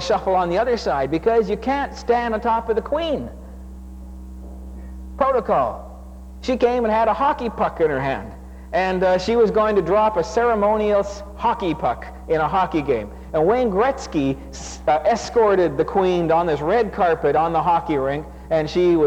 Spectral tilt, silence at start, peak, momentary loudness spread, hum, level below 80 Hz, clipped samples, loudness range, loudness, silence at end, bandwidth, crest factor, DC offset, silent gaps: -6 dB/octave; 0 s; -6 dBFS; 19 LU; none; -38 dBFS; under 0.1%; 6 LU; -20 LUFS; 0 s; 9.8 kHz; 14 dB; under 0.1%; none